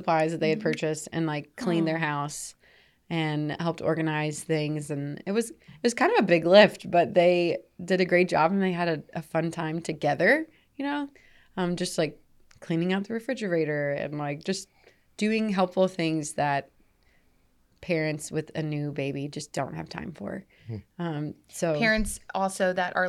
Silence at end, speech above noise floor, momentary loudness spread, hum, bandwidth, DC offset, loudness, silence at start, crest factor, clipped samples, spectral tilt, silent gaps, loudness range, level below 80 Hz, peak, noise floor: 0 s; 38 dB; 13 LU; none; 14 kHz; under 0.1%; -27 LUFS; 0 s; 22 dB; under 0.1%; -5.5 dB/octave; none; 10 LU; -54 dBFS; -4 dBFS; -64 dBFS